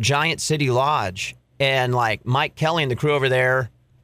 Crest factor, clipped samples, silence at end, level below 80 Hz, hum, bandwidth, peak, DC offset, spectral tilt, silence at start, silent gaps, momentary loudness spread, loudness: 14 dB; under 0.1%; 0.35 s; -54 dBFS; none; 15.5 kHz; -6 dBFS; under 0.1%; -4.5 dB/octave; 0 s; none; 6 LU; -21 LUFS